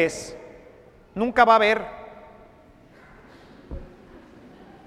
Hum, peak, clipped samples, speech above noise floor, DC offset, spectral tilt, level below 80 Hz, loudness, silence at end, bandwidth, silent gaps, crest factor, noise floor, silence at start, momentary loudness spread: none; -2 dBFS; under 0.1%; 32 dB; under 0.1%; -4 dB/octave; -50 dBFS; -20 LUFS; 1 s; 14 kHz; none; 24 dB; -52 dBFS; 0 s; 26 LU